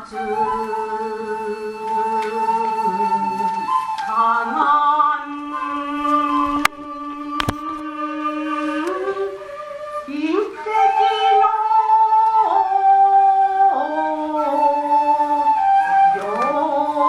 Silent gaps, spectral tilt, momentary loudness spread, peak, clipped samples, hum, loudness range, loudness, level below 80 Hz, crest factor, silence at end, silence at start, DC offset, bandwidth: none; -4.5 dB/octave; 12 LU; 0 dBFS; under 0.1%; none; 8 LU; -18 LUFS; -52 dBFS; 18 dB; 0 s; 0 s; under 0.1%; 15.5 kHz